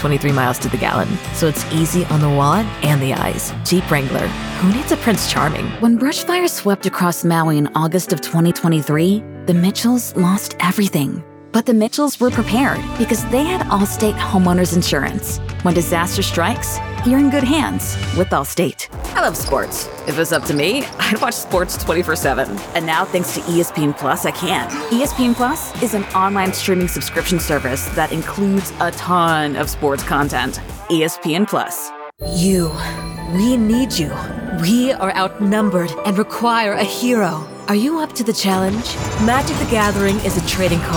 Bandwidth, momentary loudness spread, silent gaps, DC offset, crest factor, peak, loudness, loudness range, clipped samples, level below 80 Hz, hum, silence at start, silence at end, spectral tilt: over 20 kHz; 6 LU; none; under 0.1%; 16 dB; -2 dBFS; -17 LUFS; 2 LU; under 0.1%; -36 dBFS; none; 0 s; 0 s; -5 dB/octave